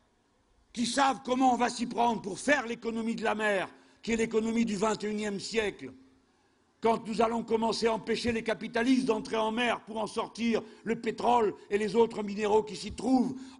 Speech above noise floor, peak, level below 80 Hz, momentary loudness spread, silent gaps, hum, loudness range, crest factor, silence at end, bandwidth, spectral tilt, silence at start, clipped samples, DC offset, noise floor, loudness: 40 dB; -12 dBFS; -60 dBFS; 7 LU; none; none; 3 LU; 18 dB; 0.05 s; 11 kHz; -4.5 dB/octave; 0.75 s; under 0.1%; under 0.1%; -69 dBFS; -30 LUFS